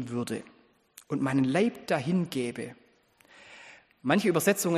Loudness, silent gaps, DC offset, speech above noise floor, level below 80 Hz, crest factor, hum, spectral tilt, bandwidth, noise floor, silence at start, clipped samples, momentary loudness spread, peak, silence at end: -28 LUFS; none; under 0.1%; 35 dB; -70 dBFS; 22 dB; none; -5.5 dB/octave; 15 kHz; -62 dBFS; 0 s; under 0.1%; 21 LU; -8 dBFS; 0 s